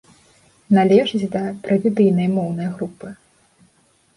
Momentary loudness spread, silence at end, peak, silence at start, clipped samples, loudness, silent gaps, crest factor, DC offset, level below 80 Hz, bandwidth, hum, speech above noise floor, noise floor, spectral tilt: 15 LU; 1 s; -2 dBFS; 0.7 s; under 0.1%; -18 LUFS; none; 18 dB; under 0.1%; -60 dBFS; 11 kHz; none; 41 dB; -59 dBFS; -8 dB/octave